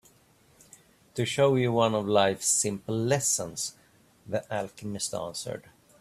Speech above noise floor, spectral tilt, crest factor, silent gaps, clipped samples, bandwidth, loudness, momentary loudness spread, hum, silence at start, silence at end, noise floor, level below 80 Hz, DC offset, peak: 34 dB; -3.5 dB/octave; 22 dB; none; under 0.1%; 15 kHz; -27 LUFS; 12 LU; none; 1.15 s; 0.4 s; -61 dBFS; -64 dBFS; under 0.1%; -8 dBFS